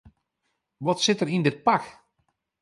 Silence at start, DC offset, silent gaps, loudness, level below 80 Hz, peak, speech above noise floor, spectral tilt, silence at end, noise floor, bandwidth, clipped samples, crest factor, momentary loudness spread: 0.8 s; under 0.1%; none; -24 LUFS; -66 dBFS; -8 dBFS; 54 dB; -4.5 dB/octave; 0.7 s; -78 dBFS; 11.5 kHz; under 0.1%; 20 dB; 8 LU